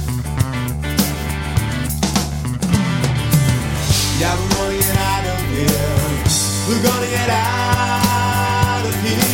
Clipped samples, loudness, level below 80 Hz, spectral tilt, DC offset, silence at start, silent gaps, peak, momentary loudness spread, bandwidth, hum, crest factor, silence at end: under 0.1%; -17 LUFS; -30 dBFS; -4.5 dB/octave; under 0.1%; 0 s; none; -2 dBFS; 5 LU; 17 kHz; none; 16 dB; 0 s